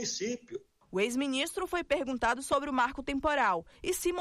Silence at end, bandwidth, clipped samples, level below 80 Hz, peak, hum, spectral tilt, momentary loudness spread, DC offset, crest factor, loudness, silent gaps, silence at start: 0 s; 15 kHz; under 0.1%; -54 dBFS; -18 dBFS; none; -3 dB/octave; 8 LU; under 0.1%; 14 dB; -31 LUFS; none; 0 s